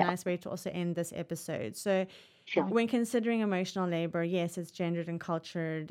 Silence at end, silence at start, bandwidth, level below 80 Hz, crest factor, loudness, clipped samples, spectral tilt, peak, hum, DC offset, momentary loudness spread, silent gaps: 0 s; 0 s; 16 kHz; -78 dBFS; 20 dB; -33 LUFS; under 0.1%; -6 dB/octave; -12 dBFS; none; under 0.1%; 8 LU; none